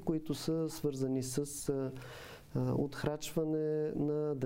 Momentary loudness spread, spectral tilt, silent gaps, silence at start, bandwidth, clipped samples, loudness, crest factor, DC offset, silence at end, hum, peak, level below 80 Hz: 7 LU; -6 dB/octave; none; 0 s; 16 kHz; under 0.1%; -36 LUFS; 16 dB; under 0.1%; 0 s; none; -20 dBFS; -58 dBFS